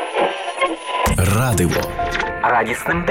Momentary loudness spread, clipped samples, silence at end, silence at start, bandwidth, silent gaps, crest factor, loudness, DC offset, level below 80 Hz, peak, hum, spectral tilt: 5 LU; under 0.1%; 0 s; 0 s; 17 kHz; none; 16 dB; -19 LUFS; under 0.1%; -32 dBFS; -4 dBFS; none; -4.5 dB/octave